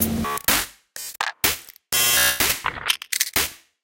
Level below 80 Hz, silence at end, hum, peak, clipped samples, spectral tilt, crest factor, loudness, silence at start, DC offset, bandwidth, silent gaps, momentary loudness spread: -46 dBFS; 0.25 s; none; -2 dBFS; under 0.1%; -1 dB/octave; 22 dB; -20 LUFS; 0 s; under 0.1%; 17.5 kHz; none; 13 LU